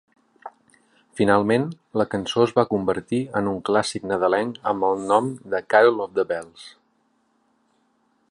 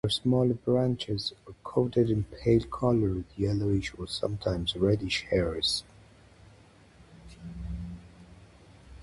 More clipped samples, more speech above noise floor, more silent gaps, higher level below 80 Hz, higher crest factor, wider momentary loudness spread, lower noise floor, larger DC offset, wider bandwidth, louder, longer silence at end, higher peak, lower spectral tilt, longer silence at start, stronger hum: neither; first, 45 dB vs 29 dB; neither; second, -58 dBFS vs -46 dBFS; about the same, 20 dB vs 18 dB; first, 21 LU vs 14 LU; first, -66 dBFS vs -56 dBFS; neither; about the same, 11.5 kHz vs 11.5 kHz; first, -22 LUFS vs -29 LUFS; first, 1.6 s vs 0 s; first, -2 dBFS vs -12 dBFS; about the same, -5.5 dB/octave vs -6 dB/octave; first, 0.45 s vs 0.05 s; neither